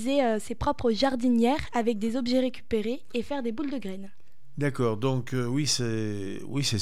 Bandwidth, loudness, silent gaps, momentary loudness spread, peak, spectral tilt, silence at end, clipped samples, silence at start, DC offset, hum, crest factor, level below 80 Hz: 15 kHz; -28 LUFS; none; 9 LU; -10 dBFS; -5 dB/octave; 0 s; under 0.1%; 0 s; 2%; none; 16 dB; -52 dBFS